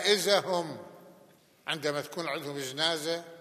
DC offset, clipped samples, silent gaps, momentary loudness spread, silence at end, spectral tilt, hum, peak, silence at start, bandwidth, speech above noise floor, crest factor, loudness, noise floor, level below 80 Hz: under 0.1%; under 0.1%; none; 16 LU; 0 s; -2.5 dB/octave; none; -8 dBFS; 0 s; 15 kHz; 29 dB; 24 dB; -30 LUFS; -60 dBFS; -88 dBFS